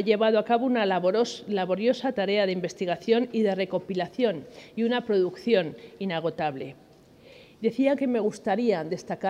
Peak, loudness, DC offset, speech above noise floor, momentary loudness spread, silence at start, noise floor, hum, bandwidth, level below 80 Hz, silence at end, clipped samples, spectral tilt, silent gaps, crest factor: -8 dBFS; -26 LUFS; under 0.1%; 27 dB; 8 LU; 0 s; -53 dBFS; none; 11 kHz; -70 dBFS; 0 s; under 0.1%; -6 dB/octave; none; 18 dB